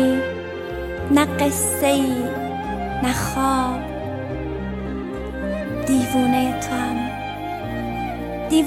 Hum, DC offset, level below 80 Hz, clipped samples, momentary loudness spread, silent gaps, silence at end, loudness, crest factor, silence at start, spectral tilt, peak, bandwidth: none; under 0.1%; -38 dBFS; under 0.1%; 10 LU; none; 0 s; -22 LUFS; 18 dB; 0 s; -4.5 dB/octave; -4 dBFS; 16.5 kHz